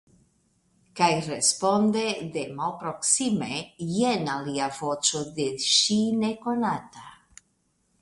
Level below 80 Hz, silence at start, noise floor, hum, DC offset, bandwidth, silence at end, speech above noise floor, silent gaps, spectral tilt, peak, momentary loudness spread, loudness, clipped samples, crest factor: -64 dBFS; 0.95 s; -71 dBFS; none; under 0.1%; 11.5 kHz; 0.85 s; 45 dB; none; -3 dB/octave; -6 dBFS; 10 LU; -25 LUFS; under 0.1%; 20 dB